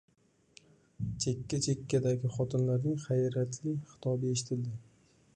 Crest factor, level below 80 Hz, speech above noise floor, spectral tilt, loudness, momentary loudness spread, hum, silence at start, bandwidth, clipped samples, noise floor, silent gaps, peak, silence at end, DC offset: 16 dB; -62 dBFS; 31 dB; -6 dB/octave; -33 LUFS; 7 LU; none; 1 s; 10.5 kHz; under 0.1%; -63 dBFS; none; -18 dBFS; 0.55 s; under 0.1%